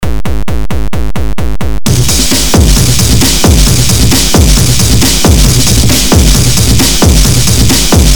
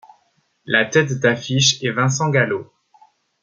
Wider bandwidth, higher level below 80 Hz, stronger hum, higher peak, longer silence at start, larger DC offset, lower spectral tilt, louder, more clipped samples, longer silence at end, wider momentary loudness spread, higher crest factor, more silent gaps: first, over 20 kHz vs 7.6 kHz; first, -12 dBFS vs -60 dBFS; neither; about the same, 0 dBFS vs -2 dBFS; second, 0 s vs 0.65 s; first, 20% vs under 0.1%; about the same, -4 dB/octave vs -3.5 dB/octave; first, -7 LUFS vs -18 LUFS; first, 2% vs under 0.1%; second, 0 s vs 0.8 s; first, 10 LU vs 4 LU; second, 8 dB vs 18 dB; neither